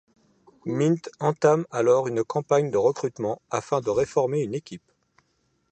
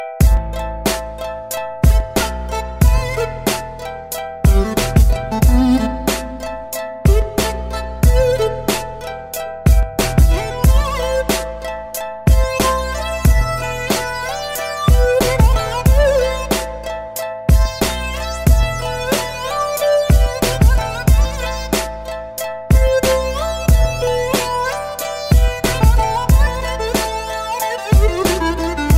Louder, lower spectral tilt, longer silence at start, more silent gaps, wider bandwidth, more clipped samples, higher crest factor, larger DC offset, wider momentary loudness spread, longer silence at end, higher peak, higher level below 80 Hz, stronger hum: second, -24 LUFS vs -17 LUFS; first, -6.5 dB/octave vs -5 dB/octave; first, 0.65 s vs 0 s; neither; second, 9 kHz vs 16.5 kHz; neither; first, 20 dB vs 14 dB; neither; about the same, 10 LU vs 11 LU; first, 0.95 s vs 0 s; second, -4 dBFS vs 0 dBFS; second, -62 dBFS vs -18 dBFS; neither